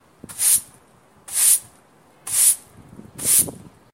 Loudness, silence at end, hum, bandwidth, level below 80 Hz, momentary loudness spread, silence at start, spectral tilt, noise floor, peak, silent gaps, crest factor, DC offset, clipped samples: -17 LUFS; 0.4 s; none; 16 kHz; -60 dBFS; 10 LU; 0.3 s; 0.5 dB/octave; -53 dBFS; -2 dBFS; none; 20 dB; under 0.1%; under 0.1%